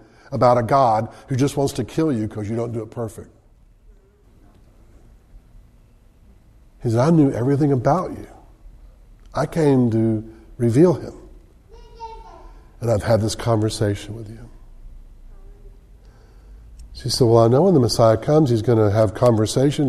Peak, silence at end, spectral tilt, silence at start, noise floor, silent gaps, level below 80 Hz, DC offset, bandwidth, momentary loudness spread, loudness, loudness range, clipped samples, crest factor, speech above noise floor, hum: -2 dBFS; 0 s; -7 dB/octave; 0.3 s; -51 dBFS; none; -44 dBFS; under 0.1%; 13.5 kHz; 17 LU; -19 LUFS; 14 LU; under 0.1%; 20 dB; 34 dB; none